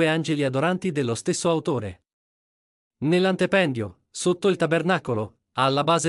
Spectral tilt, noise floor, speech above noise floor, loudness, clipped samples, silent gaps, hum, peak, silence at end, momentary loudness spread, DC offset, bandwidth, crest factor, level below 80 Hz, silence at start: -5 dB/octave; under -90 dBFS; over 67 dB; -23 LUFS; under 0.1%; 2.13-2.91 s; none; -8 dBFS; 0 s; 9 LU; under 0.1%; 11.5 kHz; 16 dB; -66 dBFS; 0 s